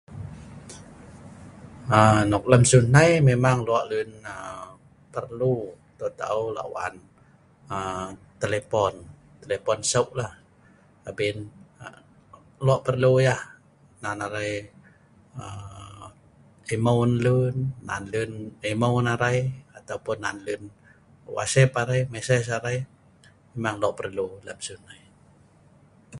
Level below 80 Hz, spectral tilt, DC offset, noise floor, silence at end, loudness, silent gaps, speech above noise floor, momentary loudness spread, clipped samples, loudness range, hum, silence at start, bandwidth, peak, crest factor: -52 dBFS; -5.5 dB/octave; under 0.1%; -56 dBFS; 0 s; -24 LUFS; none; 33 dB; 24 LU; under 0.1%; 11 LU; none; 0.1 s; 11.5 kHz; 0 dBFS; 24 dB